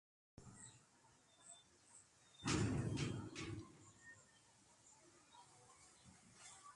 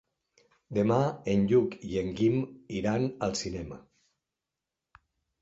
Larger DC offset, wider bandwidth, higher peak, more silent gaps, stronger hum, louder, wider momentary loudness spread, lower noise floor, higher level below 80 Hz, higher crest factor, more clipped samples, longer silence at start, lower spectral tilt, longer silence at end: neither; first, 11.5 kHz vs 8 kHz; second, -28 dBFS vs -12 dBFS; neither; neither; second, -46 LUFS vs -29 LUFS; first, 25 LU vs 12 LU; second, -72 dBFS vs -88 dBFS; second, -64 dBFS vs -56 dBFS; about the same, 22 dB vs 20 dB; neither; second, 0.4 s vs 0.7 s; second, -5 dB/octave vs -6.5 dB/octave; second, 0 s vs 1.6 s